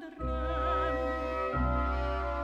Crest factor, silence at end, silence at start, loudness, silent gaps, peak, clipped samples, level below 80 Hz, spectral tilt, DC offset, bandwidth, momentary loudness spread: 12 dB; 0 s; 0 s; -32 LUFS; none; -18 dBFS; under 0.1%; -36 dBFS; -8 dB/octave; under 0.1%; 6.8 kHz; 3 LU